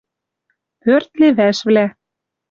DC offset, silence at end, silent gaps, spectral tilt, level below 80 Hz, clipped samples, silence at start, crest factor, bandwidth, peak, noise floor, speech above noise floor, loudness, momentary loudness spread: under 0.1%; 0.6 s; none; -6 dB/octave; -62 dBFS; under 0.1%; 0.85 s; 14 dB; 7.4 kHz; -2 dBFS; -81 dBFS; 68 dB; -15 LUFS; 8 LU